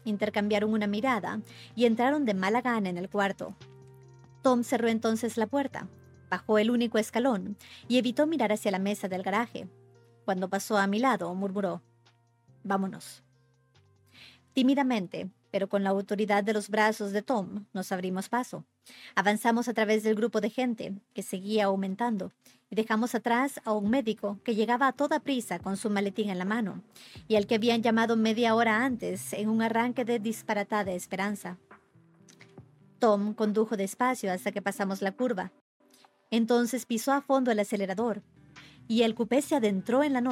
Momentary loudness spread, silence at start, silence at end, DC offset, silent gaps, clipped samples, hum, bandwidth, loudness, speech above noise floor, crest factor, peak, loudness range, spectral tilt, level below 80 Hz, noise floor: 11 LU; 0.05 s; 0 s; under 0.1%; 35.61-35.80 s; under 0.1%; none; 16 kHz; -29 LUFS; 37 dB; 20 dB; -10 dBFS; 4 LU; -5 dB/octave; -72 dBFS; -66 dBFS